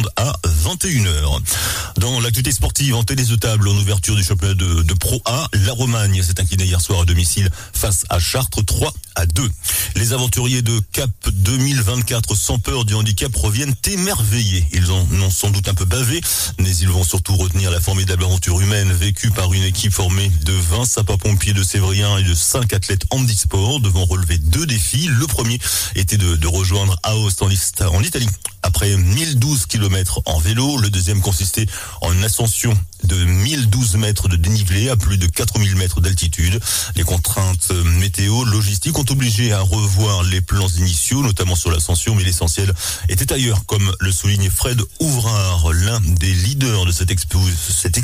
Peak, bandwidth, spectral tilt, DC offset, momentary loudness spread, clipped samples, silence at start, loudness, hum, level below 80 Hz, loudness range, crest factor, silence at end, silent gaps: -6 dBFS; 16 kHz; -4 dB/octave; under 0.1%; 3 LU; under 0.1%; 0 s; -16 LUFS; none; -26 dBFS; 1 LU; 10 dB; 0 s; none